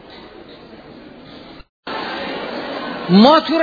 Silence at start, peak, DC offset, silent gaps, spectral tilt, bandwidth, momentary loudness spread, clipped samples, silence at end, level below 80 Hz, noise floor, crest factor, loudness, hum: 0.05 s; 0 dBFS; under 0.1%; 1.69-1.83 s; -7.5 dB/octave; 5 kHz; 28 LU; under 0.1%; 0 s; -54 dBFS; -39 dBFS; 18 dB; -16 LUFS; none